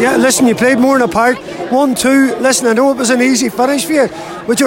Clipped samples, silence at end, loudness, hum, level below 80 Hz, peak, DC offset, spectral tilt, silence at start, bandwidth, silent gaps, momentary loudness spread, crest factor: under 0.1%; 0 s; -11 LUFS; none; -48 dBFS; -2 dBFS; under 0.1%; -3 dB/octave; 0 s; 16.5 kHz; none; 6 LU; 10 dB